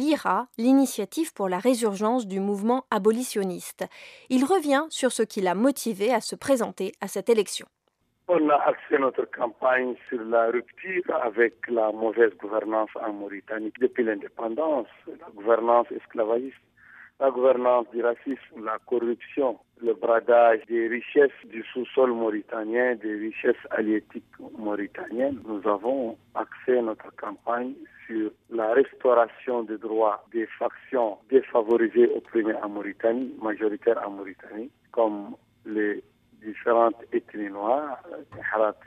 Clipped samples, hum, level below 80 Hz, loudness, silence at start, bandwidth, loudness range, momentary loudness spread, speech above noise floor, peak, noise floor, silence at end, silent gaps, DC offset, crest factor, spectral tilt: under 0.1%; none; -74 dBFS; -25 LUFS; 0 s; 15.5 kHz; 5 LU; 13 LU; 47 dB; -6 dBFS; -72 dBFS; 0.15 s; none; under 0.1%; 20 dB; -4.5 dB/octave